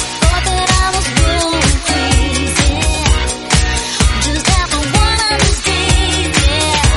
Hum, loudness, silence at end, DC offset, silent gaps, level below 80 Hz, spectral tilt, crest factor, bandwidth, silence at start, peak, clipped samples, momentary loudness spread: none; -13 LUFS; 0 s; under 0.1%; none; -16 dBFS; -3.5 dB/octave; 12 dB; 12 kHz; 0 s; 0 dBFS; under 0.1%; 2 LU